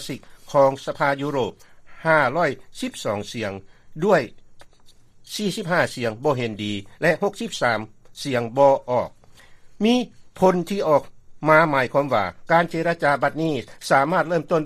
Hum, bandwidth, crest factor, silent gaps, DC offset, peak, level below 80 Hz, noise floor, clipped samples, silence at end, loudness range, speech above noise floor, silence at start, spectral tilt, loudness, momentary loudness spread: none; 14.5 kHz; 20 dB; none; under 0.1%; -2 dBFS; -54 dBFS; -49 dBFS; under 0.1%; 0 s; 5 LU; 27 dB; 0 s; -5.5 dB/octave; -22 LUFS; 12 LU